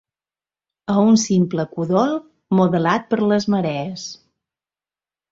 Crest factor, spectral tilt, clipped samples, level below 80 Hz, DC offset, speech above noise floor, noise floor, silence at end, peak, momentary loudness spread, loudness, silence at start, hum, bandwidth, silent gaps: 16 dB; -6 dB/octave; under 0.1%; -60 dBFS; under 0.1%; over 72 dB; under -90 dBFS; 1.15 s; -4 dBFS; 13 LU; -19 LUFS; 0.9 s; none; 7.8 kHz; none